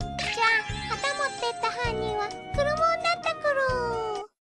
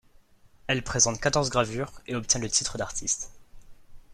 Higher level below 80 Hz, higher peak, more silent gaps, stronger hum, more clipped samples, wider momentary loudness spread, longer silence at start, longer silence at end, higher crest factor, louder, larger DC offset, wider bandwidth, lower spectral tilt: about the same, -44 dBFS vs -48 dBFS; second, -10 dBFS vs -6 dBFS; neither; neither; neither; second, 8 LU vs 12 LU; second, 0 s vs 0.65 s; first, 0.3 s vs 0 s; second, 18 dB vs 24 dB; about the same, -26 LUFS vs -26 LUFS; neither; second, 10.5 kHz vs 14 kHz; about the same, -3.5 dB/octave vs -2.5 dB/octave